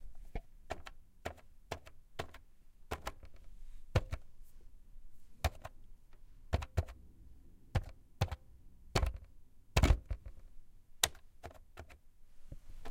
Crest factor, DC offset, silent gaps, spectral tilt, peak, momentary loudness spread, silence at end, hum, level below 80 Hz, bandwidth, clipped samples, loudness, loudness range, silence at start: 32 dB; under 0.1%; none; -4 dB/octave; -8 dBFS; 24 LU; 0 s; none; -44 dBFS; 16.5 kHz; under 0.1%; -40 LUFS; 8 LU; 0 s